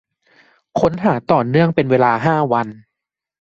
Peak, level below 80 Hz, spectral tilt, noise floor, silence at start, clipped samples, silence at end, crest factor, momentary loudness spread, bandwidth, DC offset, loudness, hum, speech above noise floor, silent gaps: -2 dBFS; -52 dBFS; -8 dB/octave; -82 dBFS; 0.75 s; under 0.1%; 0.65 s; 16 dB; 6 LU; 7.6 kHz; under 0.1%; -16 LUFS; none; 67 dB; none